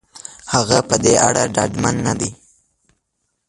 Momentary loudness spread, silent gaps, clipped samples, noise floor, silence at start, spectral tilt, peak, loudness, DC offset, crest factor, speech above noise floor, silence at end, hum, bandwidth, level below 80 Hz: 12 LU; none; under 0.1%; -72 dBFS; 0.15 s; -3.5 dB/octave; 0 dBFS; -16 LUFS; under 0.1%; 18 dB; 56 dB; 1.15 s; none; 11.5 kHz; -44 dBFS